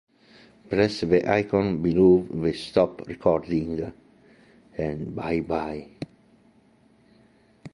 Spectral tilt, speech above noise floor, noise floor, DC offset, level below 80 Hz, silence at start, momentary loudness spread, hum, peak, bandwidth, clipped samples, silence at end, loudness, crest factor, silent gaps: -7.5 dB/octave; 36 dB; -59 dBFS; under 0.1%; -50 dBFS; 0.7 s; 17 LU; none; -6 dBFS; 11 kHz; under 0.1%; 0.05 s; -24 LUFS; 20 dB; none